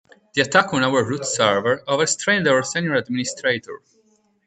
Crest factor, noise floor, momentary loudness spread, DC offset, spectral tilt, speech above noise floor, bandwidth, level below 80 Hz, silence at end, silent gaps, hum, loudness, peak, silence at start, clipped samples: 20 dB; -61 dBFS; 8 LU; under 0.1%; -3.5 dB/octave; 41 dB; 9.4 kHz; -62 dBFS; 0.7 s; none; none; -20 LUFS; 0 dBFS; 0.35 s; under 0.1%